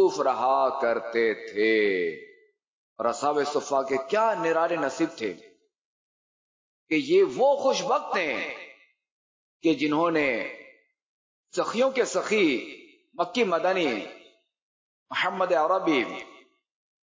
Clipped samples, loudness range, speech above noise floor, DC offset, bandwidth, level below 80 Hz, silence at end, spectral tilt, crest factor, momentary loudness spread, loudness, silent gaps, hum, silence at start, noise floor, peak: under 0.1%; 3 LU; 29 dB; under 0.1%; 7.6 kHz; -72 dBFS; 0.9 s; -4 dB/octave; 14 dB; 11 LU; -25 LUFS; 2.67-2.96 s, 5.81-6.86 s, 9.11-9.60 s, 11.03-11.44 s, 14.62-15.06 s; none; 0 s; -54 dBFS; -12 dBFS